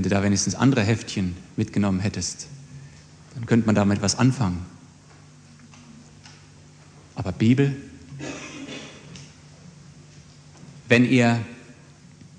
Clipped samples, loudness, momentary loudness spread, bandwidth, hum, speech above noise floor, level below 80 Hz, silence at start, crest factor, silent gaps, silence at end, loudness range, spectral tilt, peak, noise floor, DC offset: under 0.1%; -22 LUFS; 23 LU; 10 kHz; 50 Hz at -50 dBFS; 28 dB; -56 dBFS; 0 s; 22 dB; none; 0.65 s; 5 LU; -5.5 dB/octave; -2 dBFS; -49 dBFS; under 0.1%